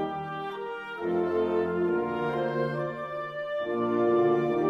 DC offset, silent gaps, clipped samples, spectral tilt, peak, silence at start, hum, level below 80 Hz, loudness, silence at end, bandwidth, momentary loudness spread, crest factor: under 0.1%; none; under 0.1%; -8.5 dB/octave; -14 dBFS; 0 s; none; -64 dBFS; -29 LUFS; 0 s; 5.6 kHz; 11 LU; 12 dB